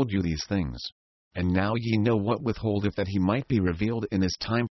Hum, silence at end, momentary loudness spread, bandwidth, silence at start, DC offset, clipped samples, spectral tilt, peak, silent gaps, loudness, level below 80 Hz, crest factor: none; 0 s; 6 LU; 6.2 kHz; 0 s; under 0.1%; under 0.1%; -7 dB/octave; -10 dBFS; 0.92-1.31 s; -27 LUFS; -42 dBFS; 16 dB